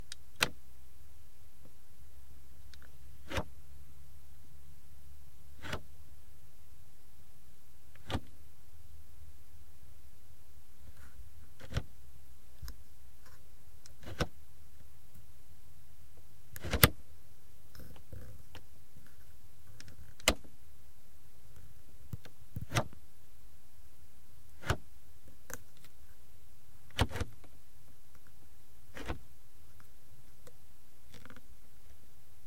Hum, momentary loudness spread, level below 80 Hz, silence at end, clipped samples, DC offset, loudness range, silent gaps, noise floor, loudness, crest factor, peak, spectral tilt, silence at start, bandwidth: none; 26 LU; -54 dBFS; 0.55 s; under 0.1%; 2%; 17 LU; none; -62 dBFS; -37 LUFS; 42 dB; -2 dBFS; -3.5 dB/octave; 0.1 s; 16.5 kHz